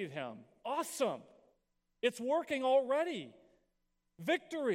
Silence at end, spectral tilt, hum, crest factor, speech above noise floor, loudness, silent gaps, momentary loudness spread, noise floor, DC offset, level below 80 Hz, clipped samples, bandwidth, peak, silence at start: 0 s; -4 dB/octave; none; 18 dB; 46 dB; -35 LUFS; none; 15 LU; -81 dBFS; under 0.1%; -84 dBFS; under 0.1%; 16 kHz; -18 dBFS; 0 s